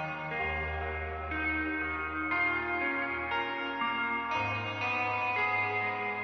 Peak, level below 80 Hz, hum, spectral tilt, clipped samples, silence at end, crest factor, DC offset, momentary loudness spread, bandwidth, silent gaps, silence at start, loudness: -18 dBFS; -50 dBFS; none; -2.5 dB/octave; under 0.1%; 0 s; 14 dB; under 0.1%; 5 LU; 6.6 kHz; none; 0 s; -31 LUFS